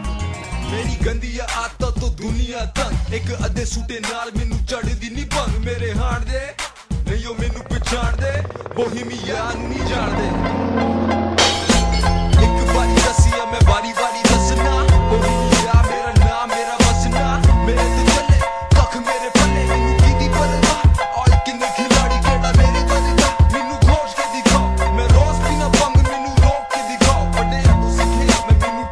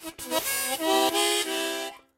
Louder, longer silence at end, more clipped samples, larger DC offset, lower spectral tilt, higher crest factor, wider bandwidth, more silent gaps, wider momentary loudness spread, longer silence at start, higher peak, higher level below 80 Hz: first, -17 LUFS vs -25 LUFS; second, 0 s vs 0.2 s; neither; neither; first, -5 dB/octave vs -0.5 dB/octave; about the same, 16 dB vs 18 dB; second, 12.5 kHz vs 16 kHz; neither; about the same, 9 LU vs 8 LU; about the same, 0 s vs 0 s; first, 0 dBFS vs -10 dBFS; first, -20 dBFS vs -64 dBFS